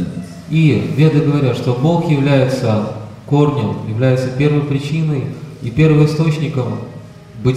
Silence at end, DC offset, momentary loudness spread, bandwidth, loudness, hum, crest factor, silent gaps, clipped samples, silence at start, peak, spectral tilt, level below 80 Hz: 0 s; under 0.1%; 12 LU; 10.5 kHz; -15 LUFS; none; 12 dB; none; under 0.1%; 0 s; -2 dBFS; -8 dB/octave; -44 dBFS